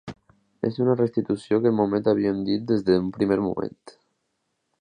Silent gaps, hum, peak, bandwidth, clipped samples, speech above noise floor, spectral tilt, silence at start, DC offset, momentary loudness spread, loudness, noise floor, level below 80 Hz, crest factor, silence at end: none; none; -6 dBFS; 9.8 kHz; under 0.1%; 53 dB; -8.5 dB/octave; 0.05 s; under 0.1%; 8 LU; -23 LUFS; -76 dBFS; -58 dBFS; 18 dB; 0.9 s